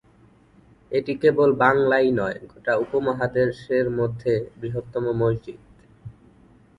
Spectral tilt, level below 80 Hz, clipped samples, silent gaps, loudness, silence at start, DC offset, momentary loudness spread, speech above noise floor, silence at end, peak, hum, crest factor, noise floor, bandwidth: -8 dB/octave; -54 dBFS; under 0.1%; none; -22 LUFS; 0.9 s; under 0.1%; 12 LU; 33 dB; 0.65 s; -2 dBFS; none; 22 dB; -55 dBFS; 10 kHz